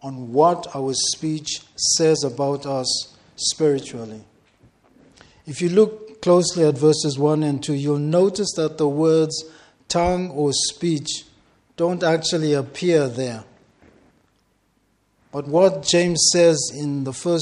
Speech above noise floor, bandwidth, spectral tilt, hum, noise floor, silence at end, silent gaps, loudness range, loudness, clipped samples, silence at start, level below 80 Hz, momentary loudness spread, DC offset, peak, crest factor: 45 dB; 11.5 kHz; -4 dB/octave; none; -65 dBFS; 0 s; none; 5 LU; -20 LUFS; under 0.1%; 0.05 s; -52 dBFS; 11 LU; under 0.1%; -2 dBFS; 18 dB